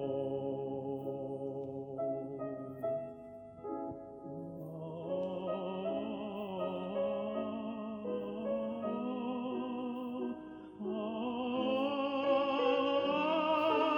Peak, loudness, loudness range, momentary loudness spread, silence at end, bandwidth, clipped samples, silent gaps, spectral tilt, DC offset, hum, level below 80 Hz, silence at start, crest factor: -20 dBFS; -37 LUFS; 8 LU; 13 LU; 0 s; 6.8 kHz; under 0.1%; none; -7.5 dB/octave; under 0.1%; none; -72 dBFS; 0 s; 18 dB